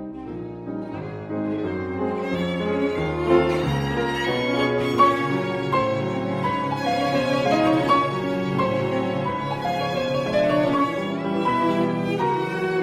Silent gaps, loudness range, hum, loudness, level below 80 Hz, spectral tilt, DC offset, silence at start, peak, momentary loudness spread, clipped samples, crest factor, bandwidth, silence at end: none; 2 LU; none; -23 LUFS; -48 dBFS; -6.5 dB/octave; under 0.1%; 0 s; -6 dBFS; 8 LU; under 0.1%; 18 dB; 14.5 kHz; 0 s